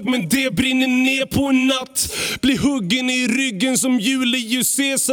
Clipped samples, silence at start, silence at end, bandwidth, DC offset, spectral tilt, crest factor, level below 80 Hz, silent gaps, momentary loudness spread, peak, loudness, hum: under 0.1%; 0 s; 0 s; over 20 kHz; under 0.1%; -3 dB/octave; 14 dB; -46 dBFS; none; 3 LU; -4 dBFS; -18 LUFS; none